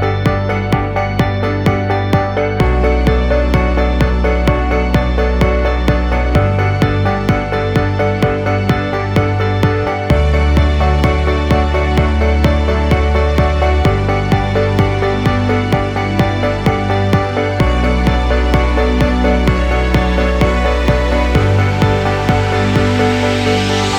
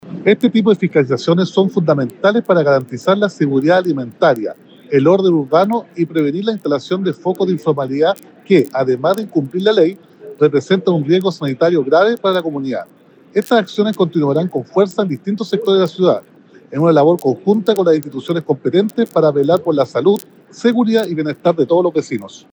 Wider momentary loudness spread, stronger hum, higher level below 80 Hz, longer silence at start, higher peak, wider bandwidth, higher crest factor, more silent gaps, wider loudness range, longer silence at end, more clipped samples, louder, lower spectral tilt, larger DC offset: second, 3 LU vs 7 LU; neither; first, -18 dBFS vs -70 dBFS; about the same, 0 s vs 0.05 s; about the same, 0 dBFS vs 0 dBFS; second, 10 kHz vs over 20 kHz; about the same, 12 dB vs 14 dB; neither; about the same, 1 LU vs 2 LU; second, 0 s vs 0.15 s; neither; about the same, -14 LUFS vs -15 LUFS; about the same, -7 dB/octave vs -7 dB/octave; neither